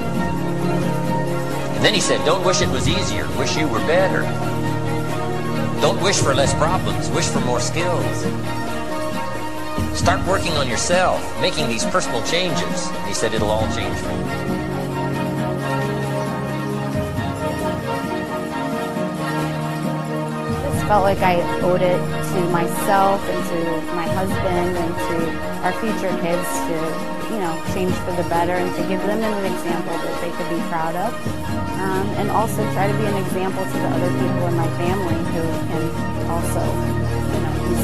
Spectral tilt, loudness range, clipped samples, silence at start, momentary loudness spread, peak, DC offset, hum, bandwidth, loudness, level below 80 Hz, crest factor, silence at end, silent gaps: -5 dB/octave; 4 LU; under 0.1%; 0 s; 7 LU; -2 dBFS; 4%; none; 16 kHz; -21 LUFS; -36 dBFS; 18 dB; 0 s; none